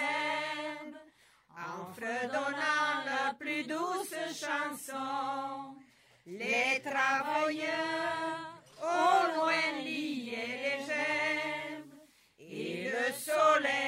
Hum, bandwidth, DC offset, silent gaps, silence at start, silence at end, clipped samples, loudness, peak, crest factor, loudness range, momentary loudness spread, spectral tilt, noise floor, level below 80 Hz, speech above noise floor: none; 16 kHz; under 0.1%; none; 0 s; 0 s; under 0.1%; -32 LUFS; -14 dBFS; 20 dB; 4 LU; 14 LU; -2.5 dB/octave; -63 dBFS; -82 dBFS; 31 dB